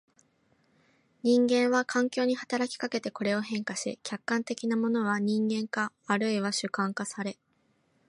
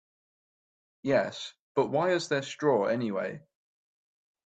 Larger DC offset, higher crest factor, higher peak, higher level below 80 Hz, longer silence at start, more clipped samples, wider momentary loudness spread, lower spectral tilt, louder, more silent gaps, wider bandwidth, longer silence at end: neither; about the same, 18 dB vs 20 dB; about the same, -12 dBFS vs -12 dBFS; second, -80 dBFS vs -74 dBFS; first, 1.25 s vs 1.05 s; neither; about the same, 9 LU vs 11 LU; about the same, -4.5 dB/octave vs -5 dB/octave; about the same, -29 LUFS vs -29 LUFS; second, none vs 1.59-1.75 s; first, 11.5 kHz vs 9 kHz; second, 0.75 s vs 1.05 s